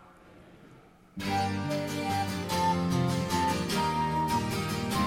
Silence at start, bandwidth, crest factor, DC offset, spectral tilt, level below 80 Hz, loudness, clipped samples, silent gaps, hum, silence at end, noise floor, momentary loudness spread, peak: 0.25 s; 17 kHz; 14 dB; under 0.1%; -5 dB/octave; -50 dBFS; -29 LUFS; under 0.1%; none; none; 0 s; -55 dBFS; 4 LU; -16 dBFS